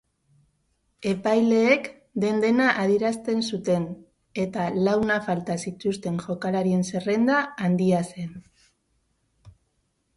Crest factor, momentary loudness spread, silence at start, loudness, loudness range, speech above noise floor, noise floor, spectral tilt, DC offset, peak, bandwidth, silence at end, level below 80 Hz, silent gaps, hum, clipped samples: 20 dB; 11 LU; 1 s; -24 LUFS; 3 LU; 49 dB; -72 dBFS; -6 dB/octave; under 0.1%; -6 dBFS; 11.5 kHz; 0.65 s; -62 dBFS; none; none; under 0.1%